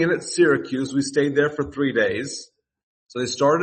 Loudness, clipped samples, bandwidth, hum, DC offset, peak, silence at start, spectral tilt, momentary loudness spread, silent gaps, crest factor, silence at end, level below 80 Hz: -22 LUFS; under 0.1%; 8.8 kHz; none; under 0.1%; -6 dBFS; 0 s; -4.5 dB/octave; 11 LU; 2.83-3.06 s; 16 dB; 0 s; -58 dBFS